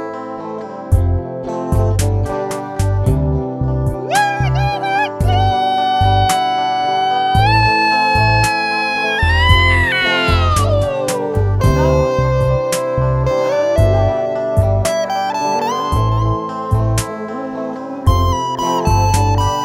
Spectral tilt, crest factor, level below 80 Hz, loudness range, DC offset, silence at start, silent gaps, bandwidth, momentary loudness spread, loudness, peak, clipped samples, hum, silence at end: -5.5 dB/octave; 14 dB; -24 dBFS; 5 LU; under 0.1%; 0 s; none; 15.5 kHz; 8 LU; -15 LUFS; 0 dBFS; under 0.1%; none; 0 s